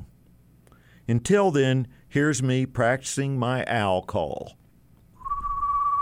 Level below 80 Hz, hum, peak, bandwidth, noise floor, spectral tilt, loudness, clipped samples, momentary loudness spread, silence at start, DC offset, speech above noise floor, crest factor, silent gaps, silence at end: -48 dBFS; none; -8 dBFS; 15 kHz; -56 dBFS; -5.5 dB/octave; -25 LUFS; under 0.1%; 12 LU; 0 s; under 0.1%; 32 dB; 18 dB; none; 0 s